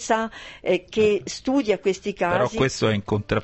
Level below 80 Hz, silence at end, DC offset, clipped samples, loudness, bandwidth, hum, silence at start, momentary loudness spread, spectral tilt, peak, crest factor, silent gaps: -48 dBFS; 0 s; under 0.1%; under 0.1%; -23 LUFS; 8.4 kHz; none; 0 s; 5 LU; -5 dB/octave; -6 dBFS; 16 dB; none